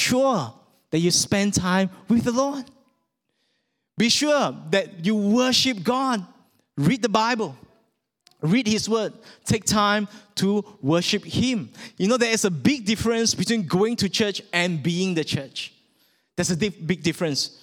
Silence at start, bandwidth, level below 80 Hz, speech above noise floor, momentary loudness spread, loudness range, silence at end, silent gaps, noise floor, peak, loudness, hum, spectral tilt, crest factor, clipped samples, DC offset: 0 s; 17.5 kHz; -54 dBFS; 51 dB; 10 LU; 3 LU; 0.15 s; none; -74 dBFS; -2 dBFS; -22 LUFS; none; -4 dB/octave; 20 dB; under 0.1%; under 0.1%